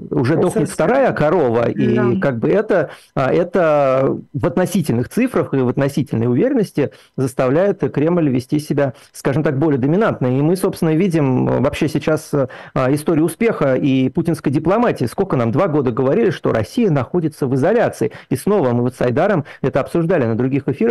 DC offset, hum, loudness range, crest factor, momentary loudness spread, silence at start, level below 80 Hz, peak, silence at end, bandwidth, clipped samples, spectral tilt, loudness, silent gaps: 0.2%; none; 1 LU; 12 dB; 5 LU; 0 s; -46 dBFS; -4 dBFS; 0 s; 12.5 kHz; under 0.1%; -7.5 dB/octave; -17 LUFS; none